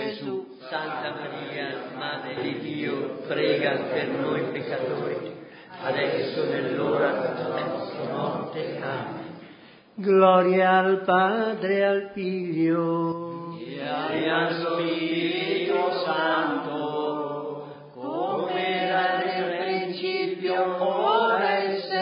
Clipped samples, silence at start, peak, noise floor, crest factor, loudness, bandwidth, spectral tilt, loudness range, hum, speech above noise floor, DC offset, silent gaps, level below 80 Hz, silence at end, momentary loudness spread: under 0.1%; 0 s; -6 dBFS; -50 dBFS; 20 dB; -25 LUFS; 5.4 kHz; -10 dB/octave; 6 LU; none; 25 dB; under 0.1%; none; -74 dBFS; 0 s; 12 LU